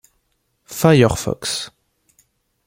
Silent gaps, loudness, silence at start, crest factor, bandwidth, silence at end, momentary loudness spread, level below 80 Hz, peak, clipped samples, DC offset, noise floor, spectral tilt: none; -17 LUFS; 0.7 s; 20 dB; 16.5 kHz; 1 s; 18 LU; -44 dBFS; -2 dBFS; under 0.1%; under 0.1%; -68 dBFS; -5.5 dB/octave